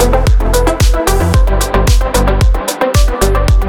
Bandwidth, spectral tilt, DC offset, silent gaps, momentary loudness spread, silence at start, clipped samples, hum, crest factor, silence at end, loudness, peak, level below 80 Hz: 17.5 kHz; -5 dB/octave; under 0.1%; none; 2 LU; 0 s; under 0.1%; none; 10 dB; 0 s; -12 LUFS; 0 dBFS; -12 dBFS